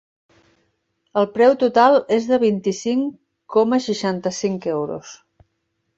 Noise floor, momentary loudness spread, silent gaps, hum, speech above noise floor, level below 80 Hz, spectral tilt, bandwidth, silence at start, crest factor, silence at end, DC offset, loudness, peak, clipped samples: -73 dBFS; 11 LU; none; none; 55 dB; -64 dBFS; -5 dB/octave; 8 kHz; 1.15 s; 18 dB; 0.8 s; under 0.1%; -19 LUFS; -2 dBFS; under 0.1%